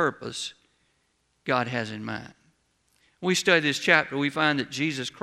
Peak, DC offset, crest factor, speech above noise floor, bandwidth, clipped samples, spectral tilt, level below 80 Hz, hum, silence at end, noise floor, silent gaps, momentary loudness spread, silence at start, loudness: -4 dBFS; under 0.1%; 24 dB; 45 dB; 15 kHz; under 0.1%; -3.5 dB/octave; -68 dBFS; none; 0.15 s; -71 dBFS; none; 14 LU; 0 s; -25 LUFS